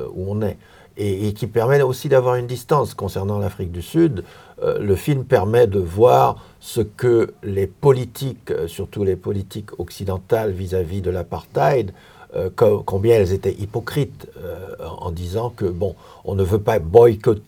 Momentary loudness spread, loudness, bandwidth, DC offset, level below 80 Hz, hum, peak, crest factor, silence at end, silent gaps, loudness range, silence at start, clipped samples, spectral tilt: 14 LU; -20 LUFS; over 20 kHz; under 0.1%; -48 dBFS; none; 0 dBFS; 20 dB; 0.05 s; none; 6 LU; 0 s; under 0.1%; -7.5 dB/octave